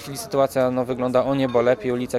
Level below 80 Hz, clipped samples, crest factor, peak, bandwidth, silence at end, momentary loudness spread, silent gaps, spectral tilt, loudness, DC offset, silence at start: -52 dBFS; under 0.1%; 16 dB; -6 dBFS; 15.5 kHz; 0 s; 4 LU; none; -6 dB/octave; -21 LUFS; under 0.1%; 0 s